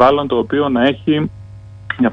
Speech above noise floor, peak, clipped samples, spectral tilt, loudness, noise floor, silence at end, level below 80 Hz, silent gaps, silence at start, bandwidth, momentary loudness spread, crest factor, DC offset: 20 dB; 0 dBFS; under 0.1%; -8 dB/octave; -16 LUFS; -35 dBFS; 0 s; -44 dBFS; none; 0 s; 6.2 kHz; 23 LU; 16 dB; under 0.1%